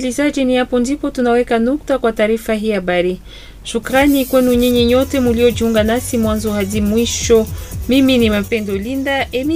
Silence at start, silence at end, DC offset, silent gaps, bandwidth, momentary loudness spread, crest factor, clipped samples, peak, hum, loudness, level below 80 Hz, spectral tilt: 0 s; 0 s; under 0.1%; none; 16 kHz; 6 LU; 14 dB; under 0.1%; 0 dBFS; none; -15 LUFS; -32 dBFS; -5 dB/octave